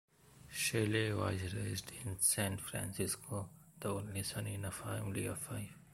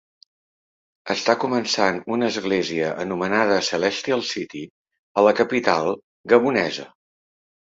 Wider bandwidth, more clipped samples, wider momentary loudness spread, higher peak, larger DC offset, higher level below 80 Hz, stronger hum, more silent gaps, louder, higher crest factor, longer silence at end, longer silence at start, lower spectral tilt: first, 16.5 kHz vs 7.8 kHz; neither; about the same, 12 LU vs 12 LU; second, -18 dBFS vs -2 dBFS; neither; about the same, -64 dBFS vs -62 dBFS; neither; second, none vs 4.70-4.85 s, 4.99-5.15 s, 6.04-6.24 s; second, -38 LUFS vs -21 LUFS; about the same, 20 dB vs 20 dB; second, 0 s vs 0.85 s; second, 0.25 s vs 1.05 s; about the same, -4 dB/octave vs -4 dB/octave